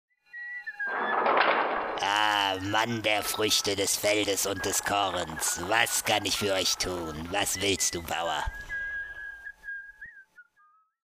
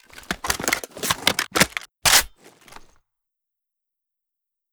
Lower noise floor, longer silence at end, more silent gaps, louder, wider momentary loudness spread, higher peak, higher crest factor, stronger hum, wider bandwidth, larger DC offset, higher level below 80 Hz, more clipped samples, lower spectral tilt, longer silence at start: second, -64 dBFS vs -83 dBFS; second, 0.75 s vs 2.45 s; neither; second, -27 LUFS vs -20 LUFS; about the same, 15 LU vs 13 LU; second, -8 dBFS vs 0 dBFS; about the same, 22 dB vs 26 dB; neither; second, 15.5 kHz vs over 20 kHz; neither; second, -52 dBFS vs -46 dBFS; neither; about the same, -1.5 dB/octave vs -1 dB/octave; first, 0.35 s vs 0.15 s